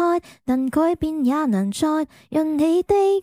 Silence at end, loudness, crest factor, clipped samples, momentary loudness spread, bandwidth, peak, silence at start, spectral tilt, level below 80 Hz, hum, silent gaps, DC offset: 0 s; -21 LUFS; 12 dB; under 0.1%; 7 LU; 16 kHz; -8 dBFS; 0 s; -6.5 dB/octave; -48 dBFS; none; none; under 0.1%